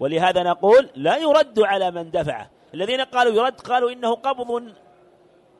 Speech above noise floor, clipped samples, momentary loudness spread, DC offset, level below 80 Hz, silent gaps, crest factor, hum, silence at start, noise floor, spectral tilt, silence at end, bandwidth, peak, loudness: 35 dB; under 0.1%; 13 LU; under 0.1%; -60 dBFS; none; 16 dB; none; 0 s; -54 dBFS; -5 dB/octave; 0.9 s; 11.5 kHz; -4 dBFS; -20 LUFS